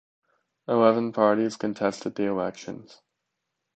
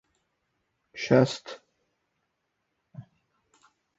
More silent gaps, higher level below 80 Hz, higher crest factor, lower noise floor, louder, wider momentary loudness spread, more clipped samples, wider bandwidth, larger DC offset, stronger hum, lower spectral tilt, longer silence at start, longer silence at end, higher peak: neither; about the same, -70 dBFS vs -66 dBFS; about the same, 22 dB vs 26 dB; about the same, -82 dBFS vs -79 dBFS; about the same, -25 LUFS vs -25 LUFS; second, 18 LU vs 24 LU; neither; about the same, 8.8 kHz vs 8 kHz; neither; neither; about the same, -6 dB/octave vs -5.5 dB/octave; second, 0.7 s vs 0.95 s; about the same, 0.95 s vs 0.95 s; about the same, -4 dBFS vs -6 dBFS